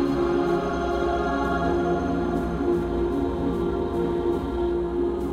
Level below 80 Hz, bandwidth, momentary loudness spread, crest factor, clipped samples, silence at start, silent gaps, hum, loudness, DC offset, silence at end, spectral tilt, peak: -36 dBFS; 10 kHz; 3 LU; 12 dB; under 0.1%; 0 s; none; none; -25 LUFS; under 0.1%; 0 s; -8 dB/octave; -12 dBFS